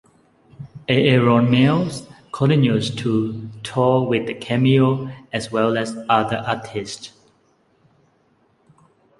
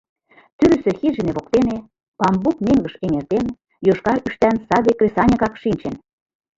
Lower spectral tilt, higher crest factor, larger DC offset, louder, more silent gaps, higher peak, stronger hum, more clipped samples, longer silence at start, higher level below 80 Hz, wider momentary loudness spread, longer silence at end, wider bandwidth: about the same, -6.5 dB/octave vs -7.5 dB/octave; about the same, 18 dB vs 18 dB; neither; about the same, -19 LUFS vs -19 LUFS; second, none vs 2.08-2.12 s; about the same, -2 dBFS vs -2 dBFS; neither; neither; about the same, 0.6 s vs 0.6 s; second, -56 dBFS vs -44 dBFS; first, 16 LU vs 8 LU; first, 2.1 s vs 0.6 s; first, 11.5 kHz vs 7.8 kHz